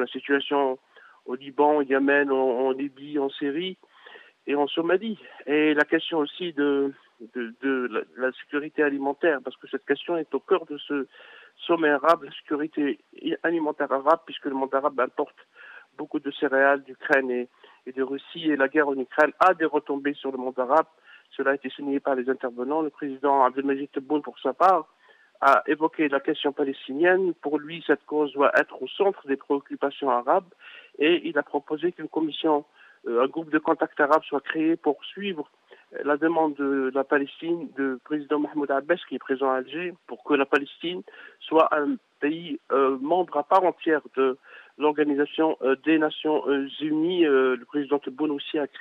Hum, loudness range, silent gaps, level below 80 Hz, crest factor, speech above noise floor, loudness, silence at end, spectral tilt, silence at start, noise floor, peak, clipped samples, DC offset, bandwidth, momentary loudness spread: none; 3 LU; none; -80 dBFS; 18 dB; 25 dB; -25 LUFS; 0 s; -6 dB/octave; 0 s; -50 dBFS; -6 dBFS; under 0.1%; under 0.1%; 7.6 kHz; 11 LU